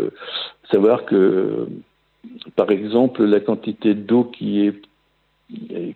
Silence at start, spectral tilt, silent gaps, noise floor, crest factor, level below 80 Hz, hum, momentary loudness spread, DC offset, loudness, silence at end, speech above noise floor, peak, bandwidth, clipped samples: 0 s; -9 dB/octave; none; -64 dBFS; 18 dB; -68 dBFS; none; 17 LU; under 0.1%; -19 LUFS; 0 s; 46 dB; -2 dBFS; 4.5 kHz; under 0.1%